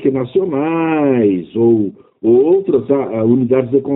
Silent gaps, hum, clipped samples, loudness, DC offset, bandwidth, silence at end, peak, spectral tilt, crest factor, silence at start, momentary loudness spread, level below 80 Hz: none; none; under 0.1%; -14 LUFS; under 0.1%; 4 kHz; 0 s; 0 dBFS; -8 dB/octave; 12 dB; 0 s; 5 LU; -56 dBFS